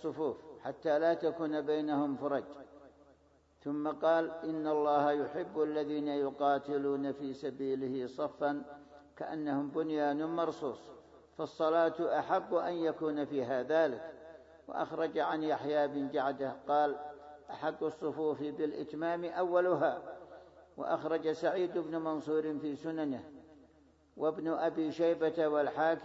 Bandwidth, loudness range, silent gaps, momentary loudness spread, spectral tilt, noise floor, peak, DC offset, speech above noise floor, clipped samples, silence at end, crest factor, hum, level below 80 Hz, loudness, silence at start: 7.6 kHz; 3 LU; none; 13 LU; -4.5 dB/octave; -67 dBFS; -16 dBFS; under 0.1%; 33 dB; under 0.1%; 0 s; 18 dB; none; -74 dBFS; -34 LUFS; 0 s